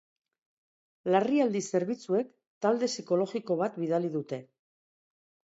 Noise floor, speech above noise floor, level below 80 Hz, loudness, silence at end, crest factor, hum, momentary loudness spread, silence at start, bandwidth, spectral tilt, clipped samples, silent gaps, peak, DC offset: under -90 dBFS; over 61 dB; -82 dBFS; -30 LUFS; 1.05 s; 20 dB; none; 10 LU; 1.05 s; 8 kHz; -5.5 dB/octave; under 0.1%; 2.47-2.61 s; -10 dBFS; under 0.1%